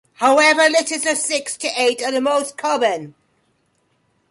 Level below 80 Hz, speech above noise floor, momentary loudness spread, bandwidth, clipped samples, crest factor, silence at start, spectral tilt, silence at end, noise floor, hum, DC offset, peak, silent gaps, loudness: -70 dBFS; 47 dB; 9 LU; 11.5 kHz; under 0.1%; 16 dB; 0.2 s; -1 dB/octave; 1.2 s; -65 dBFS; none; under 0.1%; -4 dBFS; none; -17 LUFS